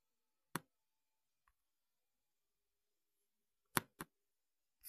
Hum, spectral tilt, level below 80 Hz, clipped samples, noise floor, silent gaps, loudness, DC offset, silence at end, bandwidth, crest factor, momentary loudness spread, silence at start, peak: none; -3 dB/octave; -80 dBFS; under 0.1%; under -90 dBFS; none; -45 LUFS; under 0.1%; 0 s; 14 kHz; 44 dB; 14 LU; 0.55 s; -10 dBFS